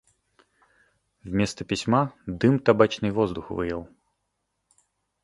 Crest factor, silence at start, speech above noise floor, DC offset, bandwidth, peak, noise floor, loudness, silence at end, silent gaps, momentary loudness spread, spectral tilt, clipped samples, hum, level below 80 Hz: 22 dB; 1.25 s; 54 dB; under 0.1%; 11.5 kHz; -4 dBFS; -78 dBFS; -25 LUFS; 1.4 s; none; 10 LU; -6.5 dB/octave; under 0.1%; none; -52 dBFS